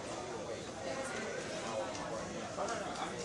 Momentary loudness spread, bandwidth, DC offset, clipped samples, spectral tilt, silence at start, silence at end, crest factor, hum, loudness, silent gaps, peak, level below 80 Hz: 3 LU; 11.5 kHz; under 0.1%; under 0.1%; -3.5 dB/octave; 0 s; 0 s; 16 dB; none; -40 LUFS; none; -26 dBFS; -66 dBFS